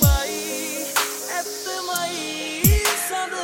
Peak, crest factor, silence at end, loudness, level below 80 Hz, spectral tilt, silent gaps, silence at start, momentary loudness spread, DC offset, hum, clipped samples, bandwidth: -2 dBFS; 22 dB; 0 s; -22 LUFS; -30 dBFS; -3.5 dB/octave; none; 0 s; 9 LU; under 0.1%; none; under 0.1%; 17 kHz